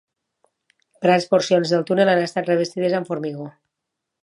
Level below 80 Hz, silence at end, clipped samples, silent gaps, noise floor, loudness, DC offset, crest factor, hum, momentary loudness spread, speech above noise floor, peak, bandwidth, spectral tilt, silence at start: -72 dBFS; 0.75 s; under 0.1%; none; -81 dBFS; -20 LUFS; under 0.1%; 18 dB; none; 11 LU; 62 dB; -2 dBFS; 11 kHz; -5.5 dB/octave; 1 s